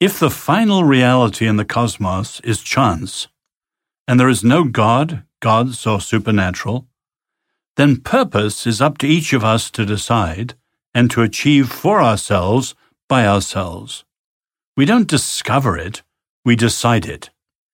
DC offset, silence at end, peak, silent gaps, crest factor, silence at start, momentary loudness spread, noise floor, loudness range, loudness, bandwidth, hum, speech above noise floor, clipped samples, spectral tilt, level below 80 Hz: under 0.1%; 0.45 s; 0 dBFS; 4.00-4.06 s, 7.68-7.75 s, 10.86-10.92 s, 13.03-13.08 s, 14.19-14.41 s, 14.66-14.74 s, 16.29-16.43 s; 16 dB; 0 s; 13 LU; -87 dBFS; 2 LU; -16 LUFS; 17 kHz; none; 72 dB; under 0.1%; -5.5 dB/octave; -44 dBFS